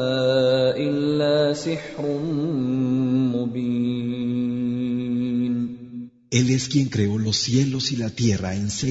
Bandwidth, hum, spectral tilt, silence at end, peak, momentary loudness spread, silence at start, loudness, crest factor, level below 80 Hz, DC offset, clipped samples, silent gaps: 8 kHz; none; -5.5 dB/octave; 0 s; -6 dBFS; 7 LU; 0 s; -22 LUFS; 16 dB; -54 dBFS; under 0.1%; under 0.1%; none